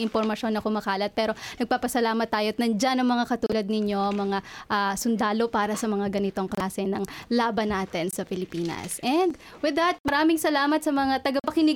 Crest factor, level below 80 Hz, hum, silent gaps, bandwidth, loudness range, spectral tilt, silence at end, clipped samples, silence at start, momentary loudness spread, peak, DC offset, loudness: 14 dB; -56 dBFS; none; 10.00-10.04 s; 18 kHz; 3 LU; -4.5 dB/octave; 0 s; under 0.1%; 0 s; 6 LU; -12 dBFS; under 0.1%; -26 LUFS